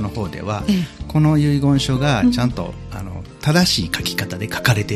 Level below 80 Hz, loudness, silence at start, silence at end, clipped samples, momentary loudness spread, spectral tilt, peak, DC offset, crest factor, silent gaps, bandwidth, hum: -38 dBFS; -18 LUFS; 0 s; 0 s; under 0.1%; 13 LU; -5.5 dB/octave; 0 dBFS; under 0.1%; 18 dB; none; 14.5 kHz; none